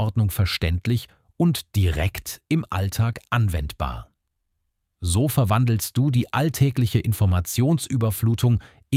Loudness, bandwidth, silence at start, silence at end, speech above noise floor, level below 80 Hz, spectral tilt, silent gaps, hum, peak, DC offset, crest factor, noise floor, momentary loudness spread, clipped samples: -23 LUFS; 16.5 kHz; 0 s; 0 s; 54 dB; -38 dBFS; -6 dB/octave; none; none; -8 dBFS; under 0.1%; 14 dB; -75 dBFS; 7 LU; under 0.1%